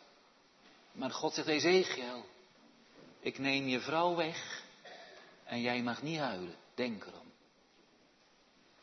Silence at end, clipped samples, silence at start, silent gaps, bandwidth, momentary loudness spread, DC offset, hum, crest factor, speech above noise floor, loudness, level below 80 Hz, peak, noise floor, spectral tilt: 1.5 s; under 0.1%; 0.65 s; none; 6.2 kHz; 22 LU; under 0.1%; none; 22 dB; 32 dB; -35 LUFS; -84 dBFS; -16 dBFS; -67 dBFS; -2.5 dB/octave